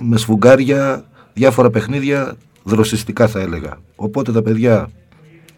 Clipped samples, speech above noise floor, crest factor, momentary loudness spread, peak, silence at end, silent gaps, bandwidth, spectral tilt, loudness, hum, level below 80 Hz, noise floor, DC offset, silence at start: under 0.1%; 31 dB; 16 dB; 16 LU; 0 dBFS; 0.65 s; none; 18 kHz; -6.5 dB/octave; -15 LUFS; none; -44 dBFS; -45 dBFS; under 0.1%; 0 s